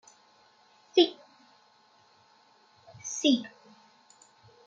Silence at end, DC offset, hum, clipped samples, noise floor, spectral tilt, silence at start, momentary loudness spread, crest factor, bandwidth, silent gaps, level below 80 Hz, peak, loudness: 1.2 s; under 0.1%; none; under 0.1%; -63 dBFS; -2.5 dB/octave; 0.95 s; 21 LU; 24 dB; 7.8 kHz; none; -86 dBFS; -10 dBFS; -27 LUFS